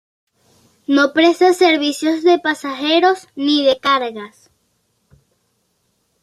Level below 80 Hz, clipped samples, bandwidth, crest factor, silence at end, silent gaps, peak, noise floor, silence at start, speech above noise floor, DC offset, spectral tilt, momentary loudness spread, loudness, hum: -66 dBFS; under 0.1%; 13.5 kHz; 16 dB; 1.95 s; none; -2 dBFS; -66 dBFS; 0.9 s; 51 dB; under 0.1%; -2.5 dB/octave; 10 LU; -15 LUFS; none